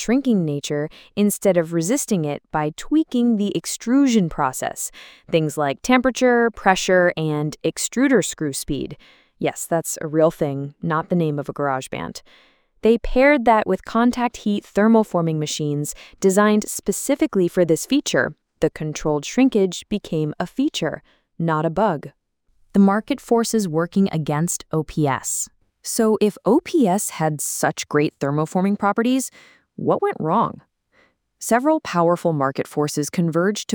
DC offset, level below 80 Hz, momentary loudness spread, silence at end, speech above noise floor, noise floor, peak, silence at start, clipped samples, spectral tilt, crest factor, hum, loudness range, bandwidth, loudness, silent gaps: under 0.1%; -46 dBFS; 9 LU; 0 s; 41 dB; -61 dBFS; -2 dBFS; 0 s; under 0.1%; -5 dB/octave; 18 dB; none; 4 LU; 20 kHz; -20 LUFS; none